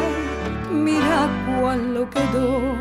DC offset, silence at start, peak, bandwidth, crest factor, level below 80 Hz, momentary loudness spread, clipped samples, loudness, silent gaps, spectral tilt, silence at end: under 0.1%; 0 s; -8 dBFS; 14.5 kHz; 14 dB; -36 dBFS; 6 LU; under 0.1%; -21 LUFS; none; -6 dB/octave; 0 s